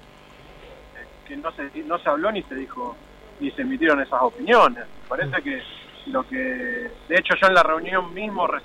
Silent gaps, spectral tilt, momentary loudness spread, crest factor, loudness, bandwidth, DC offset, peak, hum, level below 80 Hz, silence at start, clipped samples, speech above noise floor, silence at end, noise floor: none; -5 dB/octave; 18 LU; 18 dB; -22 LUFS; 14 kHz; under 0.1%; -6 dBFS; 50 Hz at -55 dBFS; -52 dBFS; 0.5 s; under 0.1%; 25 dB; 0 s; -47 dBFS